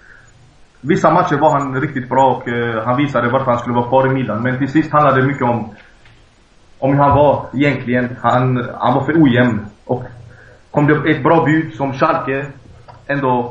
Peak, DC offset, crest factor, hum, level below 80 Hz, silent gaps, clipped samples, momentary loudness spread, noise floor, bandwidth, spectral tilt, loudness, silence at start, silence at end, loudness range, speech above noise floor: 0 dBFS; under 0.1%; 16 dB; none; -46 dBFS; none; under 0.1%; 10 LU; -48 dBFS; 7.8 kHz; -8 dB/octave; -15 LUFS; 0.85 s; 0 s; 2 LU; 34 dB